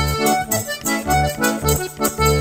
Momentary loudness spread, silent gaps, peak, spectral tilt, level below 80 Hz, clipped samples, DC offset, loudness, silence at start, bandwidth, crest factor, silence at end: 4 LU; none; -2 dBFS; -4 dB/octave; -30 dBFS; under 0.1%; under 0.1%; -19 LUFS; 0 s; 16.5 kHz; 16 dB; 0 s